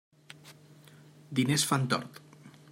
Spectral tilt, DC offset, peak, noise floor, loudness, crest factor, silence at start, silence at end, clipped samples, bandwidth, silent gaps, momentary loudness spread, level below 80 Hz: -4 dB/octave; under 0.1%; -12 dBFS; -55 dBFS; -29 LUFS; 22 dB; 0.45 s; 0.2 s; under 0.1%; 16 kHz; none; 24 LU; -74 dBFS